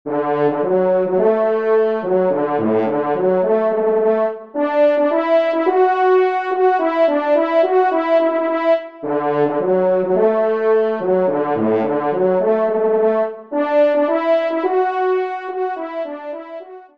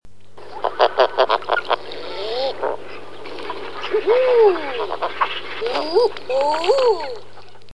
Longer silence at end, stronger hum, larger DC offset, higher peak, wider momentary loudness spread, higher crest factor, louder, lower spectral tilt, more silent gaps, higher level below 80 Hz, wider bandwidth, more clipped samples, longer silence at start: about the same, 0.15 s vs 0.25 s; second, none vs 50 Hz at -55 dBFS; second, 0.2% vs 3%; about the same, -2 dBFS vs 0 dBFS; second, 7 LU vs 15 LU; second, 14 dB vs 20 dB; first, -17 LUFS vs -20 LUFS; first, -8.5 dB/octave vs -3.5 dB/octave; neither; second, -68 dBFS vs -62 dBFS; second, 5.6 kHz vs 11 kHz; neither; about the same, 0.05 s vs 0 s